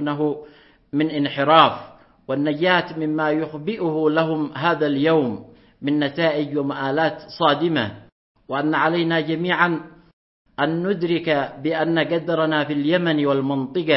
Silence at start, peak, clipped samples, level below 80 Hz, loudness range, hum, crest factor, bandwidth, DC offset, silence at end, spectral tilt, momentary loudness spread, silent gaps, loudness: 0 s; 0 dBFS; under 0.1%; -62 dBFS; 2 LU; none; 20 dB; 5.8 kHz; under 0.1%; 0 s; -10 dB/octave; 7 LU; 8.12-8.35 s, 10.13-10.45 s; -21 LUFS